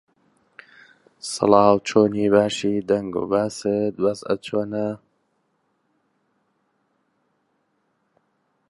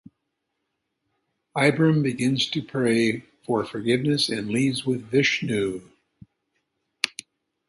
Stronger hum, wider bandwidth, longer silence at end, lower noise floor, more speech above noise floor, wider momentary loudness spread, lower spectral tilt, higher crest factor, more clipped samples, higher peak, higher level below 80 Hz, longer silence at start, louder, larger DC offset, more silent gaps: neither; about the same, 11.5 kHz vs 11.5 kHz; first, 3.75 s vs 0.6 s; second, -70 dBFS vs -79 dBFS; second, 50 dB vs 56 dB; first, 12 LU vs 8 LU; about the same, -5.5 dB/octave vs -5 dB/octave; about the same, 22 dB vs 24 dB; neither; about the same, -2 dBFS vs 0 dBFS; about the same, -60 dBFS vs -62 dBFS; second, 1.25 s vs 1.55 s; about the same, -21 LUFS vs -23 LUFS; neither; neither